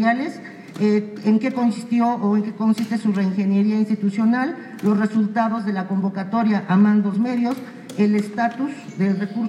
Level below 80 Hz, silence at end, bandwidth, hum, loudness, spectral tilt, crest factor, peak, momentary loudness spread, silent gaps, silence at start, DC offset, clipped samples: -72 dBFS; 0 s; 11 kHz; none; -21 LUFS; -8 dB/octave; 14 dB; -6 dBFS; 6 LU; none; 0 s; under 0.1%; under 0.1%